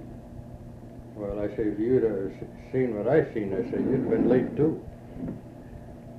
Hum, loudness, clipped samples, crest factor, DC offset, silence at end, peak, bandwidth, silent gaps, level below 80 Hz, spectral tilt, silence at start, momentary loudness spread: none; -27 LUFS; under 0.1%; 18 dB; under 0.1%; 0 s; -10 dBFS; 7.2 kHz; none; -50 dBFS; -10 dB/octave; 0 s; 20 LU